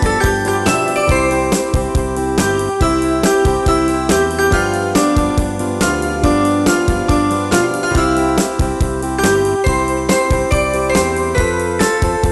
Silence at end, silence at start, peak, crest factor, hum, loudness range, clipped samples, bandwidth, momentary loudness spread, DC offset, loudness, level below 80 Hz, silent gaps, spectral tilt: 0 s; 0 s; -2 dBFS; 12 dB; none; 1 LU; under 0.1%; 12.5 kHz; 3 LU; under 0.1%; -15 LUFS; -24 dBFS; none; -5 dB/octave